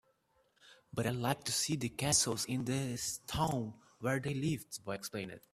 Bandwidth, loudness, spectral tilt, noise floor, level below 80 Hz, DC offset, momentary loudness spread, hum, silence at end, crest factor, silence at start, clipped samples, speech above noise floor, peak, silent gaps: 15.5 kHz; -36 LUFS; -3.5 dB/octave; -74 dBFS; -62 dBFS; under 0.1%; 12 LU; none; 0.15 s; 24 dB; 0.65 s; under 0.1%; 38 dB; -14 dBFS; none